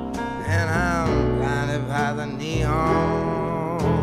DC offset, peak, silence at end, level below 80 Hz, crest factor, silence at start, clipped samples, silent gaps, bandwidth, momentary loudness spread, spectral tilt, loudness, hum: under 0.1%; -8 dBFS; 0 s; -34 dBFS; 16 dB; 0 s; under 0.1%; none; 14 kHz; 5 LU; -6.5 dB/octave; -23 LUFS; none